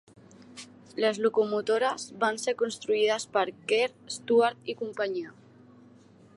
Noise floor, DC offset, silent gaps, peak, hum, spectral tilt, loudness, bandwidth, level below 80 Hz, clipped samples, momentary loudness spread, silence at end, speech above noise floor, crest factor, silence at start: -55 dBFS; under 0.1%; none; -10 dBFS; none; -3 dB/octave; -28 LUFS; 11.5 kHz; -78 dBFS; under 0.1%; 17 LU; 1.05 s; 28 dB; 18 dB; 0.5 s